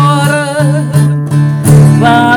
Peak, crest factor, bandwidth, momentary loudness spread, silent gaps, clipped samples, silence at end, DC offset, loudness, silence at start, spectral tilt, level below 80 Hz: 0 dBFS; 8 dB; 15.5 kHz; 6 LU; none; 5%; 0 s; under 0.1%; -8 LUFS; 0 s; -6.5 dB/octave; -36 dBFS